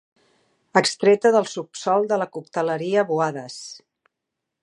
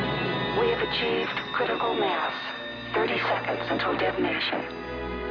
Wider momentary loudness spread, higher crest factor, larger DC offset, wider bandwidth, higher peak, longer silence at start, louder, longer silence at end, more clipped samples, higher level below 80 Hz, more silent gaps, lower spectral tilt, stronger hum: first, 15 LU vs 8 LU; first, 22 dB vs 14 dB; neither; first, 11 kHz vs 5.4 kHz; first, -2 dBFS vs -14 dBFS; first, 0.75 s vs 0 s; first, -21 LUFS vs -27 LUFS; first, 0.85 s vs 0 s; neither; second, -78 dBFS vs -50 dBFS; neither; second, -4 dB/octave vs -6.5 dB/octave; neither